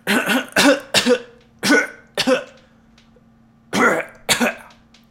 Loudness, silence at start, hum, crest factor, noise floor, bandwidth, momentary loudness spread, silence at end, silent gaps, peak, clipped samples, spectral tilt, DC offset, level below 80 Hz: -18 LUFS; 0.05 s; none; 20 dB; -52 dBFS; 17 kHz; 9 LU; 0.5 s; none; 0 dBFS; under 0.1%; -2.5 dB/octave; under 0.1%; -56 dBFS